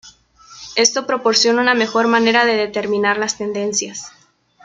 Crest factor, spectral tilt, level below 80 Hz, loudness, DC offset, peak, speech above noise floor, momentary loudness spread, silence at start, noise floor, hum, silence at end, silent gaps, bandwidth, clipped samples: 16 dB; -2 dB/octave; -60 dBFS; -16 LUFS; under 0.1%; 0 dBFS; 29 dB; 11 LU; 0.05 s; -45 dBFS; none; 0.55 s; none; 9.4 kHz; under 0.1%